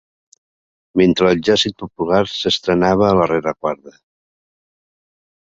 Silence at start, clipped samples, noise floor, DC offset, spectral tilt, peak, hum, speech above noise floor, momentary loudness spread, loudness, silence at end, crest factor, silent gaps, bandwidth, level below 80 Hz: 0.95 s; under 0.1%; under -90 dBFS; under 0.1%; -5.5 dB/octave; 0 dBFS; none; over 74 dB; 10 LU; -16 LUFS; 1.6 s; 18 dB; none; 7.8 kHz; -46 dBFS